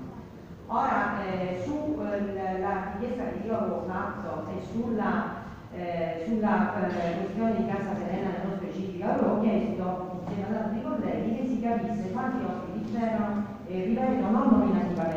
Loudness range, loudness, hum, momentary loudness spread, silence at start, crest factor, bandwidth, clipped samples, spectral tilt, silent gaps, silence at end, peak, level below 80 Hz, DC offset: 3 LU; -29 LUFS; none; 9 LU; 0 s; 20 dB; 7.6 kHz; under 0.1%; -8.5 dB/octave; none; 0 s; -10 dBFS; -54 dBFS; under 0.1%